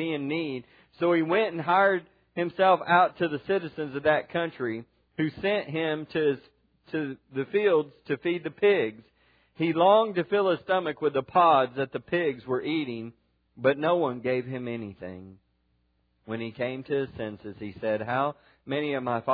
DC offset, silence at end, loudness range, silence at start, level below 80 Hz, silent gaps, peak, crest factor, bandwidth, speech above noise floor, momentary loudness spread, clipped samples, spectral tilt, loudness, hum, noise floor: under 0.1%; 0 s; 8 LU; 0 s; -68 dBFS; none; -8 dBFS; 20 dB; 5 kHz; 44 dB; 14 LU; under 0.1%; -9 dB/octave; -27 LUFS; none; -71 dBFS